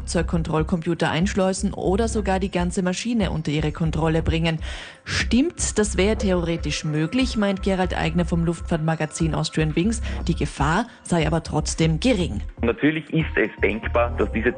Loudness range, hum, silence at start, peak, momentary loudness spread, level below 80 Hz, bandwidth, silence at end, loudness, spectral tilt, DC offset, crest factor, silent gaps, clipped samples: 1 LU; none; 0 s; -8 dBFS; 4 LU; -32 dBFS; 10 kHz; 0 s; -23 LUFS; -5.5 dB/octave; under 0.1%; 14 dB; none; under 0.1%